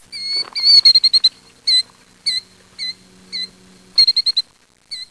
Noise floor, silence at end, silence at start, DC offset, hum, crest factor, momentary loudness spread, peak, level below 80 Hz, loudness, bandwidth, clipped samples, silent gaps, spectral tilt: -46 dBFS; 0.05 s; 0.1 s; under 0.1%; none; 16 dB; 21 LU; -2 dBFS; -60 dBFS; -12 LUFS; 11 kHz; under 0.1%; none; 1.5 dB/octave